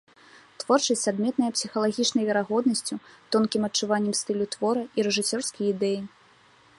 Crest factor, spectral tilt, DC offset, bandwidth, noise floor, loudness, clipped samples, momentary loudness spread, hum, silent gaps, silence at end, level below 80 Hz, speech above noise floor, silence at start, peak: 20 dB; -3.5 dB/octave; under 0.1%; 11.5 kHz; -57 dBFS; -25 LUFS; under 0.1%; 6 LU; none; none; 0.7 s; -70 dBFS; 32 dB; 0.6 s; -8 dBFS